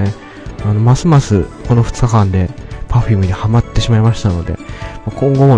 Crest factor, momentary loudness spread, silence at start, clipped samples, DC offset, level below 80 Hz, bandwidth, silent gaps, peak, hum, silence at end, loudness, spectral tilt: 12 dB; 14 LU; 0 s; 0.5%; under 0.1%; -26 dBFS; 9.8 kHz; none; 0 dBFS; none; 0 s; -13 LUFS; -7.5 dB/octave